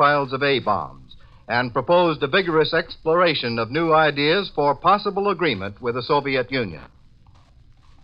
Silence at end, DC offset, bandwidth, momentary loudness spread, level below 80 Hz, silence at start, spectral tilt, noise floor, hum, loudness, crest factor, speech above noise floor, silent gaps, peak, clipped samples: 1.15 s; under 0.1%; 5.6 kHz; 8 LU; -50 dBFS; 0 s; -8 dB/octave; -51 dBFS; none; -20 LUFS; 16 dB; 31 dB; none; -4 dBFS; under 0.1%